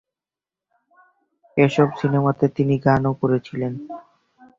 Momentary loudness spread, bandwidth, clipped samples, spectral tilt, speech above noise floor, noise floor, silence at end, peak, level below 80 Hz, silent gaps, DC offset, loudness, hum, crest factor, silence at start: 12 LU; 7.4 kHz; under 0.1%; -8.5 dB/octave; 71 dB; -90 dBFS; 0.6 s; -2 dBFS; -54 dBFS; none; under 0.1%; -20 LUFS; none; 20 dB; 1.55 s